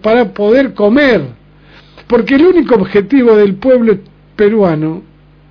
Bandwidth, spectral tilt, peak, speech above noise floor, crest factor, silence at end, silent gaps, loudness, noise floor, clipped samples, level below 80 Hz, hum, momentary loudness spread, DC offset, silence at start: 5.4 kHz; -8.5 dB/octave; 0 dBFS; 31 dB; 10 dB; 0.5 s; none; -10 LUFS; -40 dBFS; 0.1%; -42 dBFS; 50 Hz at -40 dBFS; 8 LU; under 0.1%; 0.05 s